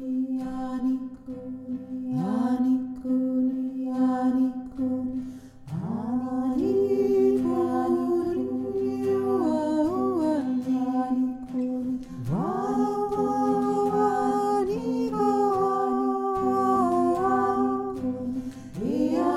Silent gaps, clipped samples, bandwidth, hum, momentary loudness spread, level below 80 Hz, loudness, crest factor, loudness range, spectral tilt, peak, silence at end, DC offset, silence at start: none; under 0.1%; 12 kHz; none; 9 LU; -56 dBFS; -26 LUFS; 14 dB; 3 LU; -8 dB/octave; -12 dBFS; 0 s; under 0.1%; 0 s